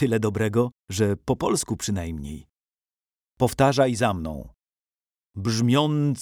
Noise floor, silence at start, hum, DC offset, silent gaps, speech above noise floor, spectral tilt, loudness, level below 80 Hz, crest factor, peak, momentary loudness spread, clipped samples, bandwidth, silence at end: under -90 dBFS; 0 s; none; under 0.1%; none; over 67 dB; -5.5 dB/octave; -24 LUFS; -48 dBFS; 18 dB; -6 dBFS; 14 LU; under 0.1%; over 20 kHz; 0 s